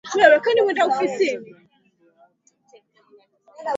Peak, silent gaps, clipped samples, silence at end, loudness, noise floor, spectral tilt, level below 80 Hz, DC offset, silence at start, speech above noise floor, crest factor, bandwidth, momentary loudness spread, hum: 0 dBFS; none; under 0.1%; 0 s; -18 LUFS; -61 dBFS; -3 dB/octave; -74 dBFS; under 0.1%; 0.05 s; 43 dB; 22 dB; 7.8 kHz; 15 LU; none